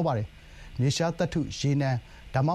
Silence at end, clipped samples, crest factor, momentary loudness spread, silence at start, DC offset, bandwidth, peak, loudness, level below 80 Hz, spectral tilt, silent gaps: 0 s; under 0.1%; 16 dB; 8 LU; 0 s; under 0.1%; 11.5 kHz; -12 dBFS; -28 LUFS; -48 dBFS; -6 dB/octave; none